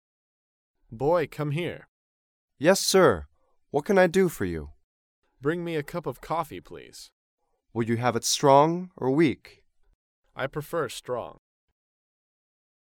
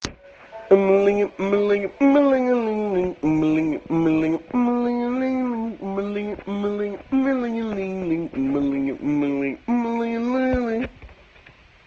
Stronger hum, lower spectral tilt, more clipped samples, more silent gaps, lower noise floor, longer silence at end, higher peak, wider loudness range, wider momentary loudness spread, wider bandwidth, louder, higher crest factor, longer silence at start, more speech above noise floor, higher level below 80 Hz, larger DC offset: neither; second, -4.5 dB/octave vs -7.5 dB/octave; neither; first, 1.88-2.48 s, 4.84-5.22 s, 7.12-7.38 s, 9.95-10.23 s vs none; first, under -90 dBFS vs -50 dBFS; first, 1.5 s vs 0.75 s; second, -6 dBFS vs -2 dBFS; first, 9 LU vs 5 LU; first, 17 LU vs 10 LU; first, 18 kHz vs 7.6 kHz; second, -25 LUFS vs -22 LUFS; about the same, 22 dB vs 20 dB; first, 0.9 s vs 0 s; first, over 65 dB vs 30 dB; second, -56 dBFS vs -48 dBFS; neither